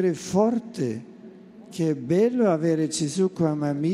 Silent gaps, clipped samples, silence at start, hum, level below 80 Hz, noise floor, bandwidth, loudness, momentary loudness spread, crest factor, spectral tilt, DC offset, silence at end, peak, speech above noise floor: none; under 0.1%; 0 s; none; -64 dBFS; -45 dBFS; 13 kHz; -24 LUFS; 9 LU; 16 dB; -6.5 dB/octave; under 0.1%; 0 s; -8 dBFS; 22 dB